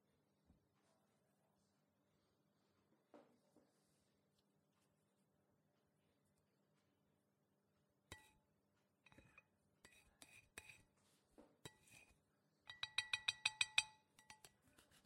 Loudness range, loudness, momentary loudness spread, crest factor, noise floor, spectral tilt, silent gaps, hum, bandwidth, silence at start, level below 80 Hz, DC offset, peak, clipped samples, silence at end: 21 LU; -43 LUFS; 26 LU; 38 dB; -85 dBFS; 0.5 dB/octave; none; none; 16 kHz; 3.15 s; -88 dBFS; under 0.1%; -18 dBFS; under 0.1%; 0.7 s